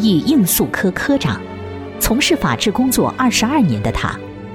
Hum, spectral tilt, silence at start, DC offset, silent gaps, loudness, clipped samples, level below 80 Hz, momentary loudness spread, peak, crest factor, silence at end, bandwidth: none; -4.5 dB/octave; 0 s; under 0.1%; none; -16 LUFS; under 0.1%; -34 dBFS; 12 LU; -2 dBFS; 14 dB; 0 s; 18.5 kHz